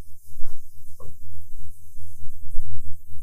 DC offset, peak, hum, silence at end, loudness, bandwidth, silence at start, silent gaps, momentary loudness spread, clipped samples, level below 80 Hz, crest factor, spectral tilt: under 0.1%; -2 dBFS; none; 0 s; -44 LUFS; 1.1 kHz; 0 s; none; 9 LU; under 0.1%; -32 dBFS; 12 dB; -7 dB/octave